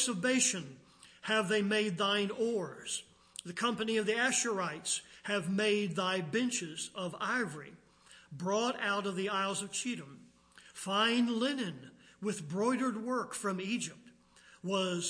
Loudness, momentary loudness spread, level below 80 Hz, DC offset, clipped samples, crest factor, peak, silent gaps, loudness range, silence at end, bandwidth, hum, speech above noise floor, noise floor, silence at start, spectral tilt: -33 LUFS; 13 LU; -78 dBFS; under 0.1%; under 0.1%; 18 dB; -16 dBFS; none; 3 LU; 0 s; 10.5 kHz; none; 28 dB; -61 dBFS; 0 s; -3 dB/octave